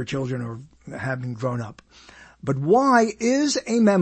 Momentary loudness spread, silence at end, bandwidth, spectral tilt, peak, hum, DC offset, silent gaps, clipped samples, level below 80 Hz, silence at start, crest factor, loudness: 17 LU; 0 s; 8.8 kHz; -5.5 dB/octave; -6 dBFS; none; under 0.1%; none; under 0.1%; -58 dBFS; 0 s; 16 dB; -22 LUFS